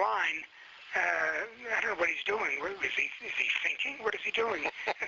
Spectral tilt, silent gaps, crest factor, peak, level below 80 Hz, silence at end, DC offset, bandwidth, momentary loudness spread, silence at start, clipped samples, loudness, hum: 1.5 dB/octave; none; 18 dB; -14 dBFS; -70 dBFS; 0 s; under 0.1%; 7.6 kHz; 6 LU; 0 s; under 0.1%; -31 LUFS; none